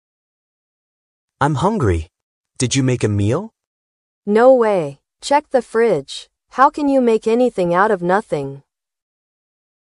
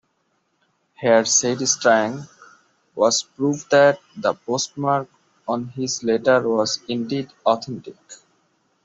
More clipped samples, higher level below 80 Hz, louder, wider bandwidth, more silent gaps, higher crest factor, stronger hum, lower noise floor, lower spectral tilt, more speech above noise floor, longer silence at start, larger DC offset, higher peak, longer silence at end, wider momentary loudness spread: neither; first, -44 dBFS vs -66 dBFS; first, -16 LUFS vs -20 LUFS; first, 11.5 kHz vs 8.2 kHz; first, 2.23-2.44 s, 3.67-4.22 s vs none; about the same, 18 dB vs 18 dB; neither; first, under -90 dBFS vs -69 dBFS; first, -6 dB/octave vs -3 dB/octave; first, over 74 dB vs 49 dB; first, 1.4 s vs 1 s; neither; about the same, 0 dBFS vs -2 dBFS; first, 1.3 s vs 0.7 s; about the same, 15 LU vs 13 LU